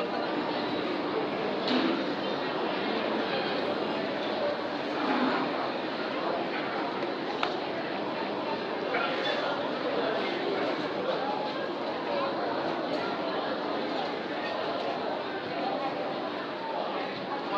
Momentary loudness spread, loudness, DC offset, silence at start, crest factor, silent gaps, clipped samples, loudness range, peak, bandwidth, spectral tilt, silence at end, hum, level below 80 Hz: 4 LU; -31 LUFS; under 0.1%; 0 s; 24 dB; none; under 0.1%; 2 LU; -6 dBFS; 8.4 kHz; -5.5 dB/octave; 0 s; none; -76 dBFS